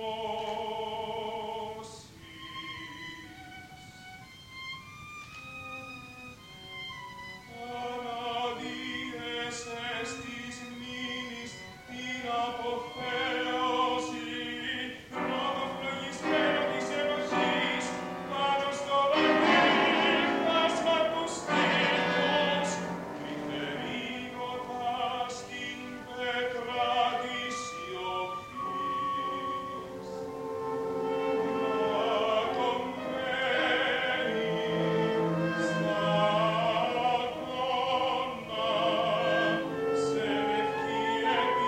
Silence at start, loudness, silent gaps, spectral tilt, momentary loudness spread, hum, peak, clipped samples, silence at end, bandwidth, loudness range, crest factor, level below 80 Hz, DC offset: 0 s; -30 LUFS; none; -4 dB/octave; 16 LU; none; -12 dBFS; under 0.1%; 0 s; 16 kHz; 15 LU; 20 dB; -64 dBFS; under 0.1%